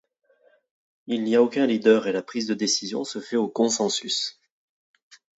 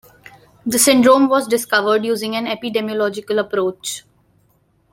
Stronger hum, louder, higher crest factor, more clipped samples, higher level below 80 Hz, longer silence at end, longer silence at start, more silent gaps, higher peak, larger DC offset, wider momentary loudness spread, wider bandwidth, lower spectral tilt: neither; second, -23 LUFS vs -17 LUFS; about the same, 20 dB vs 18 dB; neither; second, -76 dBFS vs -60 dBFS; first, 1.1 s vs 0.95 s; first, 1.1 s vs 0.65 s; neither; second, -6 dBFS vs 0 dBFS; neither; second, 10 LU vs 13 LU; second, 8.2 kHz vs 16.5 kHz; about the same, -3 dB/octave vs -2.5 dB/octave